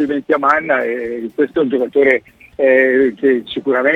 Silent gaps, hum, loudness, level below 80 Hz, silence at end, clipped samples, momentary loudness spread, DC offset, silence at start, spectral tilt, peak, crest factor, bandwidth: none; none; -15 LUFS; -56 dBFS; 0 s; under 0.1%; 8 LU; under 0.1%; 0 s; -6.5 dB/octave; 0 dBFS; 14 dB; 6.4 kHz